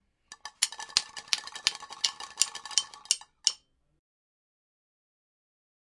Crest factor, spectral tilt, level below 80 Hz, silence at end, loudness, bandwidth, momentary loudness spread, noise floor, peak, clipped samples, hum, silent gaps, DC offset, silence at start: 34 dB; 3.5 dB/octave; -72 dBFS; 2.4 s; -29 LUFS; 11.5 kHz; 4 LU; -51 dBFS; 0 dBFS; under 0.1%; none; none; under 0.1%; 0.3 s